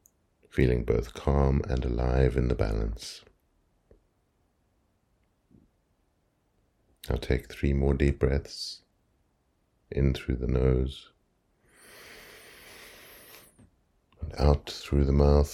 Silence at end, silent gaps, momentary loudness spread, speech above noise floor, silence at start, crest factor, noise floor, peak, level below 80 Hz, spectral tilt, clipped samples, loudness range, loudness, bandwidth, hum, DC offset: 0 s; none; 22 LU; 46 dB; 0.55 s; 24 dB; -72 dBFS; -6 dBFS; -34 dBFS; -7.5 dB/octave; under 0.1%; 14 LU; -28 LUFS; 14 kHz; none; under 0.1%